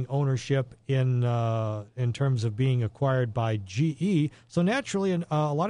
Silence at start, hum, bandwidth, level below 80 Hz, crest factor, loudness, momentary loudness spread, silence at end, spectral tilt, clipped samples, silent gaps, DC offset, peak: 0 s; none; 10 kHz; -60 dBFS; 14 dB; -27 LUFS; 4 LU; 0 s; -7 dB/octave; under 0.1%; none; under 0.1%; -12 dBFS